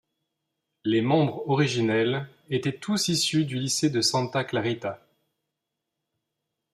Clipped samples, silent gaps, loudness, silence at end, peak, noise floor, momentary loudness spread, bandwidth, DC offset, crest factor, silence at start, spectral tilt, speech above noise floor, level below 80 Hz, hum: under 0.1%; none; -25 LUFS; 1.75 s; -10 dBFS; -84 dBFS; 9 LU; 14.5 kHz; under 0.1%; 18 dB; 0.85 s; -4.5 dB/octave; 59 dB; -68 dBFS; none